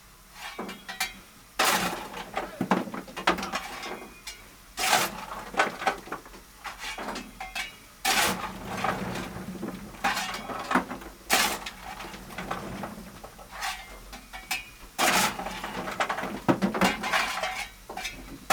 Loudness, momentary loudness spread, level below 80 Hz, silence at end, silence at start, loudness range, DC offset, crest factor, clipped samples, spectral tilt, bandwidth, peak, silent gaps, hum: -29 LUFS; 17 LU; -52 dBFS; 0 s; 0 s; 4 LU; under 0.1%; 24 dB; under 0.1%; -2.5 dB/octave; over 20 kHz; -6 dBFS; none; none